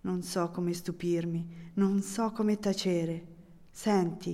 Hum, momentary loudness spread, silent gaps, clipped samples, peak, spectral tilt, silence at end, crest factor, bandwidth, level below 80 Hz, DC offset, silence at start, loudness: none; 8 LU; none; under 0.1%; -16 dBFS; -6 dB/octave; 0 s; 16 dB; 15.5 kHz; -64 dBFS; under 0.1%; 0.05 s; -31 LUFS